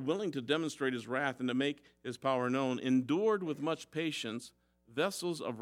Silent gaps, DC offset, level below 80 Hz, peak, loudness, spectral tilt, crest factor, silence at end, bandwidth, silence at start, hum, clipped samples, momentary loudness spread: none; under 0.1%; -78 dBFS; -16 dBFS; -34 LUFS; -5 dB/octave; 18 dB; 0 s; 15 kHz; 0 s; none; under 0.1%; 10 LU